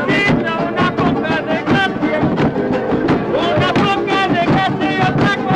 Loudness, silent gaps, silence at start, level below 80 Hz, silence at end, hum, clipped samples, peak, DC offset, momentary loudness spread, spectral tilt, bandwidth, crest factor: -15 LUFS; none; 0 s; -40 dBFS; 0 s; none; under 0.1%; -4 dBFS; under 0.1%; 3 LU; -6.5 dB/octave; 10.5 kHz; 12 dB